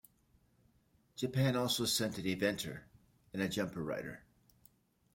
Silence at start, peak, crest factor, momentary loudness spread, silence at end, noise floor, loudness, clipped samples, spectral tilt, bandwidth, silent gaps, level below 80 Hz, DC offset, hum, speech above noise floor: 1.15 s; -18 dBFS; 20 dB; 16 LU; 0.95 s; -72 dBFS; -36 LUFS; under 0.1%; -4.5 dB/octave; 16.5 kHz; none; -68 dBFS; under 0.1%; none; 36 dB